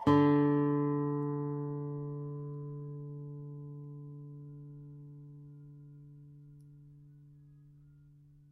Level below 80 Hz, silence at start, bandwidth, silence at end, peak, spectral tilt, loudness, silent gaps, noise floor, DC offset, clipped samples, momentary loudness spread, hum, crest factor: -70 dBFS; 0 s; 5 kHz; 0.85 s; -16 dBFS; -10 dB/octave; -34 LUFS; none; -59 dBFS; under 0.1%; under 0.1%; 26 LU; none; 20 dB